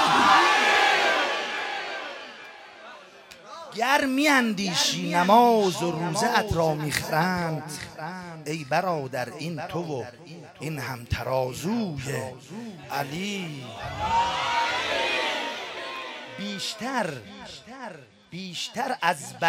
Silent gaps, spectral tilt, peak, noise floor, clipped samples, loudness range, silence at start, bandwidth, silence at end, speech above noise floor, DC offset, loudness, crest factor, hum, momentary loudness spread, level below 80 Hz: none; -3.5 dB/octave; -4 dBFS; -48 dBFS; under 0.1%; 9 LU; 0 s; 16.5 kHz; 0 s; 21 dB; under 0.1%; -25 LUFS; 22 dB; none; 21 LU; -54 dBFS